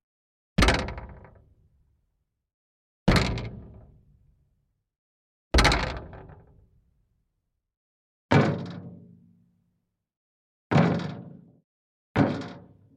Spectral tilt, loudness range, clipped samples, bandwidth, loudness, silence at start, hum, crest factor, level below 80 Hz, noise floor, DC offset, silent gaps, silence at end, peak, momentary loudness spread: -5.5 dB/octave; 4 LU; under 0.1%; 13 kHz; -25 LUFS; 0.6 s; none; 24 dB; -38 dBFS; -80 dBFS; under 0.1%; 2.54-3.06 s, 4.98-5.51 s, 7.77-8.29 s, 10.17-10.70 s, 11.64-12.15 s; 0.4 s; -6 dBFS; 22 LU